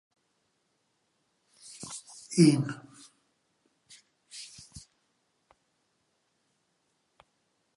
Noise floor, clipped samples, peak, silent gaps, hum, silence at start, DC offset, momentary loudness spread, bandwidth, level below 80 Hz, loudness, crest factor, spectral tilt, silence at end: -76 dBFS; under 0.1%; -8 dBFS; none; none; 1.8 s; under 0.1%; 27 LU; 11.5 kHz; -72 dBFS; -27 LUFS; 26 dB; -6 dB/octave; 3 s